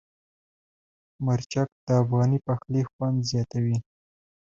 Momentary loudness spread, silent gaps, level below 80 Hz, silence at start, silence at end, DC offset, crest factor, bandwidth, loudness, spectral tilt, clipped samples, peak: 6 LU; 1.72-1.87 s, 2.93-2.99 s; -58 dBFS; 1.2 s; 0.8 s; under 0.1%; 18 dB; 7.6 kHz; -26 LUFS; -7 dB/octave; under 0.1%; -8 dBFS